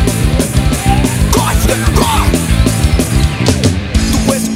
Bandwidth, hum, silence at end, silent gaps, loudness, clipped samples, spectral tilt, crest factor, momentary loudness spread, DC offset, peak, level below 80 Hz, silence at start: 16.5 kHz; none; 0 s; none; -12 LUFS; under 0.1%; -5 dB/octave; 10 dB; 2 LU; 0.4%; 0 dBFS; -16 dBFS; 0 s